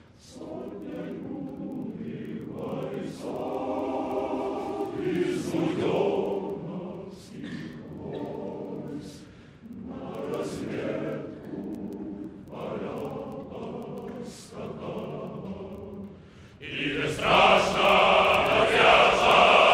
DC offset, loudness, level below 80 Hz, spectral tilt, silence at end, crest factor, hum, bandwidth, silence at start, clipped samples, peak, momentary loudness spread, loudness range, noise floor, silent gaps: under 0.1%; -26 LUFS; -56 dBFS; -4.5 dB/octave; 0 s; 22 dB; none; 16 kHz; 0.25 s; under 0.1%; -6 dBFS; 21 LU; 15 LU; -49 dBFS; none